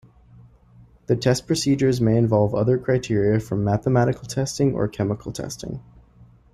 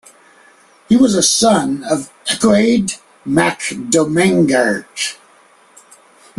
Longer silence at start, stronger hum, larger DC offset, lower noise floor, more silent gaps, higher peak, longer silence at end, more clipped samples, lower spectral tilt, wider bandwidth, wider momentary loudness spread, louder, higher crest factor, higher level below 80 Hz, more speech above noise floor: first, 1.1 s vs 0.9 s; neither; neither; about the same, -51 dBFS vs -49 dBFS; neither; second, -6 dBFS vs 0 dBFS; second, 0.3 s vs 1.25 s; neither; first, -6.5 dB/octave vs -4 dB/octave; first, 14.5 kHz vs 12.5 kHz; about the same, 12 LU vs 11 LU; second, -22 LUFS vs -14 LUFS; about the same, 16 dB vs 16 dB; about the same, -48 dBFS vs -52 dBFS; second, 30 dB vs 35 dB